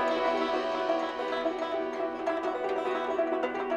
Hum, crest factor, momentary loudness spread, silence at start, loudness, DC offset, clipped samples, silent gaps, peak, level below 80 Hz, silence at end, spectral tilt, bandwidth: none; 16 dB; 4 LU; 0 s; -30 LUFS; under 0.1%; under 0.1%; none; -14 dBFS; -64 dBFS; 0 s; -4 dB/octave; 9.8 kHz